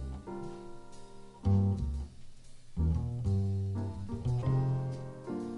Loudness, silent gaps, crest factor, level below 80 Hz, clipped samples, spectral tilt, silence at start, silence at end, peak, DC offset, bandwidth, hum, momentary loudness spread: -34 LUFS; none; 14 dB; -42 dBFS; under 0.1%; -9 dB/octave; 0 s; 0 s; -18 dBFS; under 0.1%; 10 kHz; none; 19 LU